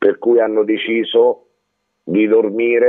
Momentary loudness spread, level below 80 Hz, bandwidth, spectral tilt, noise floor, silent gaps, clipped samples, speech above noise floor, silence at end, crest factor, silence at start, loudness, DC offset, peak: 6 LU; -72 dBFS; 3.9 kHz; -8.5 dB/octave; -70 dBFS; none; under 0.1%; 56 dB; 0 s; 14 dB; 0 s; -15 LUFS; under 0.1%; 0 dBFS